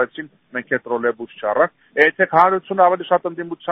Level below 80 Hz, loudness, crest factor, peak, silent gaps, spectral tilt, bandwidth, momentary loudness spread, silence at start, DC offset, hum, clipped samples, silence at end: -66 dBFS; -18 LUFS; 18 dB; 0 dBFS; none; -3 dB/octave; 4.5 kHz; 13 LU; 0 s; under 0.1%; none; under 0.1%; 0 s